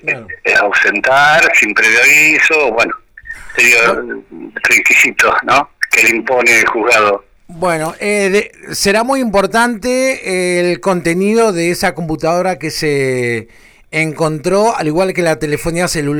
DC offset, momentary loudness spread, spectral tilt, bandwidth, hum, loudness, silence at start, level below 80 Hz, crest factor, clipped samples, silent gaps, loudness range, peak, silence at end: under 0.1%; 10 LU; -3.5 dB/octave; over 20 kHz; none; -11 LUFS; 0.05 s; -42 dBFS; 10 dB; under 0.1%; none; 6 LU; -2 dBFS; 0 s